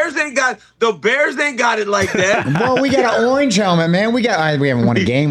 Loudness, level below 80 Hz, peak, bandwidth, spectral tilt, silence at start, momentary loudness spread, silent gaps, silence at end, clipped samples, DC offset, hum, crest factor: -15 LUFS; -52 dBFS; -4 dBFS; 13 kHz; -5 dB/octave; 0 s; 3 LU; none; 0 s; under 0.1%; under 0.1%; none; 12 dB